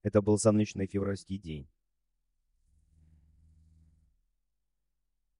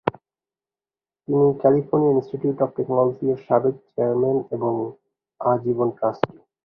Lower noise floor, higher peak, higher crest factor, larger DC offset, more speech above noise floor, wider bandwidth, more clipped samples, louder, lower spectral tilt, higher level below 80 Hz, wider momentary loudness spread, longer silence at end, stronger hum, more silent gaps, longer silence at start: second, -85 dBFS vs under -90 dBFS; second, -12 dBFS vs 0 dBFS; about the same, 24 dB vs 22 dB; neither; second, 55 dB vs over 69 dB; first, 10.5 kHz vs 5.2 kHz; neither; second, -30 LUFS vs -22 LUFS; second, -6.5 dB/octave vs -11 dB/octave; about the same, -60 dBFS vs -62 dBFS; first, 16 LU vs 9 LU; first, 3.75 s vs 0.4 s; neither; neither; about the same, 0.05 s vs 0.05 s